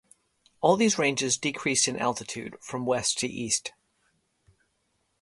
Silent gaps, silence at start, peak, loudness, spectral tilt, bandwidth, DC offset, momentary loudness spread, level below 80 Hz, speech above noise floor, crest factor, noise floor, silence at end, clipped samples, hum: none; 0.6 s; -8 dBFS; -26 LUFS; -2.5 dB/octave; 11.5 kHz; under 0.1%; 13 LU; -66 dBFS; 47 dB; 22 dB; -74 dBFS; 1.5 s; under 0.1%; none